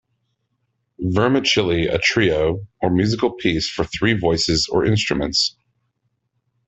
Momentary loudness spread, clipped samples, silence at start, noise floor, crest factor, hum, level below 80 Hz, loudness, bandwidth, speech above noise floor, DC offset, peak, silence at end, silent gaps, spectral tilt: 6 LU; under 0.1%; 1 s; -71 dBFS; 18 dB; none; -42 dBFS; -19 LUFS; 8.4 kHz; 53 dB; under 0.1%; -4 dBFS; 1.15 s; none; -4.5 dB/octave